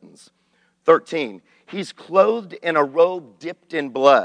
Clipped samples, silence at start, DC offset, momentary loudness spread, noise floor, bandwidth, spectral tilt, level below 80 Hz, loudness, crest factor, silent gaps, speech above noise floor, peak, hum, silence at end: under 0.1%; 0.9 s; under 0.1%; 14 LU; -64 dBFS; 10 kHz; -5 dB/octave; -74 dBFS; -20 LUFS; 18 dB; none; 45 dB; -2 dBFS; none; 0 s